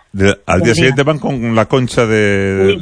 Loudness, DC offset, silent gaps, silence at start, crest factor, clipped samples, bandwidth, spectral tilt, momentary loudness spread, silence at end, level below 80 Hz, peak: -13 LUFS; under 0.1%; none; 0.15 s; 12 dB; under 0.1%; 10.5 kHz; -5.5 dB/octave; 4 LU; 0 s; -38 dBFS; 0 dBFS